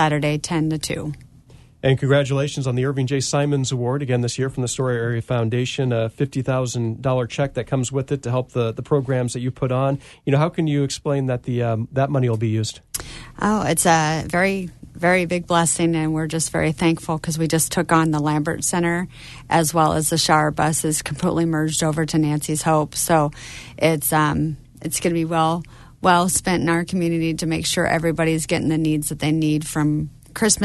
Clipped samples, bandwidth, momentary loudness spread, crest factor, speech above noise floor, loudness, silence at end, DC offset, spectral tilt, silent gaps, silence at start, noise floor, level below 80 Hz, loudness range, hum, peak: under 0.1%; 12.5 kHz; 7 LU; 18 dB; 27 dB; -21 LUFS; 0 s; under 0.1%; -5 dB/octave; none; 0 s; -47 dBFS; -46 dBFS; 3 LU; none; -2 dBFS